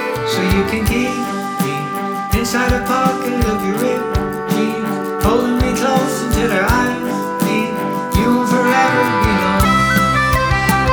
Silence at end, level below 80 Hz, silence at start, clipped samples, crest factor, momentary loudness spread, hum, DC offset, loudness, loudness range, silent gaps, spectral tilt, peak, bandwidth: 0 s; -28 dBFS; 0 s; under 0.1%; 16 dB; 7 LU; none; under 0.1%; -16 LUFS; 3 LU; none; -5 dB/octave; 0 dBFS; over 20 kHz